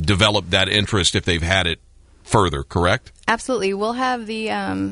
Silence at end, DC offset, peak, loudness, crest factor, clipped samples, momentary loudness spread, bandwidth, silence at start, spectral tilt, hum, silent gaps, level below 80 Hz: 0 s; under 0.1%; -2 dBFS; -19 LUFS; 18 dB; under 0.1%; 7 LU; 11 kHz; 0 s; -4 dB/octave; none; none; -38 dBFS